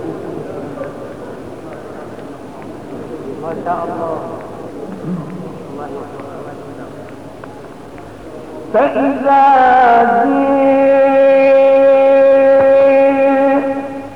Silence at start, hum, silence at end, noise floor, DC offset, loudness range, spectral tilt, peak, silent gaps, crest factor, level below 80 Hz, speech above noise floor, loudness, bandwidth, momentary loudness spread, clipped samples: 0 s; none; 0 s; -32 dBFS; 0.8%; 19 LU; -7 dB/octave; -2 dBFS; none; 12 dB; -50 dBFS; 20 dB; -11 LUFS; 6 kHz; 22 LU; under 0.1%